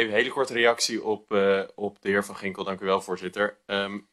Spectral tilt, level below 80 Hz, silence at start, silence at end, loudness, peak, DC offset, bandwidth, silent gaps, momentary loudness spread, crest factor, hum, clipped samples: -3.5 dB/octave; -68 dBFS; 0 s; 0.15 s; -26 LUFS; -8 dBFS; under 0.1%; 13 kHz; none; 10 LU; 18 dB; none; under 0.1%